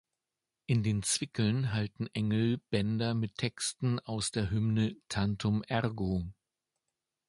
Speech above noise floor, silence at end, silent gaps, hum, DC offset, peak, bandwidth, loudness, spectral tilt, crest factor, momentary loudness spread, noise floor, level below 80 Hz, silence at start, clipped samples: 58 dB; 0.95 s; none; none; under 0.1%; -14 dBFS; 11.5 kHz; -32 LUFS; -5 dB/octave; 18 dB; 5 LU; -89 dBFS; -54 dBFS; 0.7 s; under 0.1%